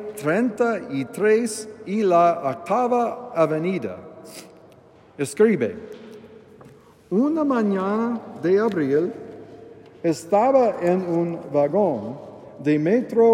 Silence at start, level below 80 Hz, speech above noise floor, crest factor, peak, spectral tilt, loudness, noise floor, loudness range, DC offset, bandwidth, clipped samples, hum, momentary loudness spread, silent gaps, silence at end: 0 s; -70 dBFS; 30 dB; 16 dB; -6 dBFS; -6.5 dB/octave; -22 LUFS; -50 dBFS; 4 LU; under 0.1%; 16 kHz; under 0.1%; none; 20 LU; none; 0 s